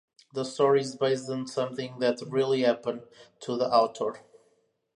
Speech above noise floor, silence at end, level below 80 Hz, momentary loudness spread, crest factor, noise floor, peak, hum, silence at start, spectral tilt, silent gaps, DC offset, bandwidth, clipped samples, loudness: 42 dB; 0.75 s; -78 dBFS; 11 LU; 20 dB; -70 dBFS; -8 dBFS; none; 0.35 s; -5 dB/octave; none; under 0.1%; 10.5 kHz; under 0.1%; -28 LUFS